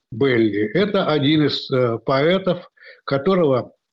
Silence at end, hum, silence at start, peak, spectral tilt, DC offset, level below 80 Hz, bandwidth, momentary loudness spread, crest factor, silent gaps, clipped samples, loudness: 0.25 s; none; 0.1 s; -8 dBFS; -8 dB/octave; under 0.1%; -58 dBFS; 7.4 kHz; 7 LU; 12 dB; none; under 0.1%; -19 LUFS